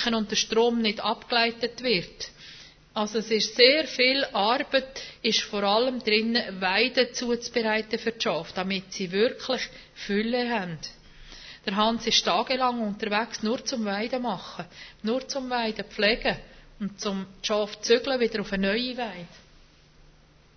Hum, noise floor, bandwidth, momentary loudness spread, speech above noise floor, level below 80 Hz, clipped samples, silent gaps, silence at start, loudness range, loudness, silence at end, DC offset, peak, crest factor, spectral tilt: none; -56 dBFS; 6.6 kHz; 14 LU; 30 dB; -56 dBFS; under 0.1%; none; 0 s; 6 LU; -25 LUFS; 1.2 s; under 0.1%; -4 dBFS; 22 dB; -3 dB/octave